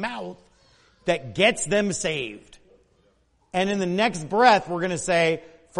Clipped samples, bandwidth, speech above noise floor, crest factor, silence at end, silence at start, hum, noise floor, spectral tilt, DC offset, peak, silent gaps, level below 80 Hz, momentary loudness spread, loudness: under 0.1%; 11.5 kHz; 41 dB; 20 dB; 0 s; 0 s; none; -64 dBFS; -4 dB/octave; under 0.1%; -4 dBFS; none; -56 dBFS; 14 LU; -23 LUFS